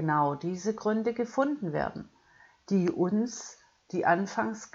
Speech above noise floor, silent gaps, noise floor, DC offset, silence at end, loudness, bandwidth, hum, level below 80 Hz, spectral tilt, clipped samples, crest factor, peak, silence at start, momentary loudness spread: 31 dB; none; -60 dBFS; under 0.1%; 0.1 s; -30 LUFS; 7.8 kHz; none; -64 dBFS; -6.5 dB/octave; under 0.1%; 18 dB; -12 dBFS; 0 s; 9 LU